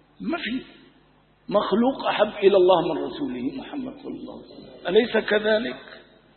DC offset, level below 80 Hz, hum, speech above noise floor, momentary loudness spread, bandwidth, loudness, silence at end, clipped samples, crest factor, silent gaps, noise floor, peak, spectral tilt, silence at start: under 0.1%; -58 dBFS; none; 35 dB; 18 LU; 4.4 kHz; -23 LUFS; 0.35 s; under 0.1%; 20 dB; none; -58 dBFS; -4 dBFS; -10 dB/octave; 0.2 s